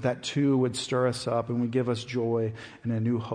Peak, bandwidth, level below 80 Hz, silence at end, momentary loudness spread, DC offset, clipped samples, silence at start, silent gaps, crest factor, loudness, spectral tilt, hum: -14 dBFS; 10.5 kHz; -66 dBFS; 0 s; 5 LU; under 0.1%; under 0.1%; 0 s; none; 14 dB; -28 LUFS; -6 dB/octave; none